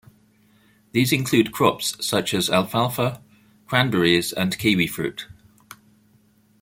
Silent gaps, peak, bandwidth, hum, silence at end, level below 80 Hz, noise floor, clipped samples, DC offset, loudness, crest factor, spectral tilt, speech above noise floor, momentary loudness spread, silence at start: none; -2 dBFS; 17 kHz; none; 1.3 s; -56 dBFS; -59 dBFS; under 0.1%; under 0.1%; -21 LUFS; 22 dB; -4.5 dB/octave; 38 dB; 9 LU; 0.95 s